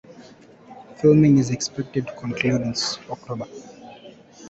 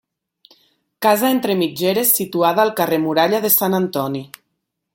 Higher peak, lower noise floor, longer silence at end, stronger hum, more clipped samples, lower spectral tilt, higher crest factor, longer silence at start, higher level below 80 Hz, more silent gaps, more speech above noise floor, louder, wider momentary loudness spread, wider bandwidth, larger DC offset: second, -4 dBFS vs 0 dBFS; second, -47 dBFS vs -75 dBFS; second, 0 s vs 0.7 s; neither; neither; first, -5.5 dB/octave vs -4 dB/octave; about the same, 18 dB vs 18 dB; second, 0.1 s vs 1 s; first, -56 dBFS vs -64 dBFS; neither; second, 27 dB vs 58 dB; second, -21 LUFS vs -17 LUFS; first, 25 LU vs 6 LU; second, 8.2 kHz vs 17 kHz; neither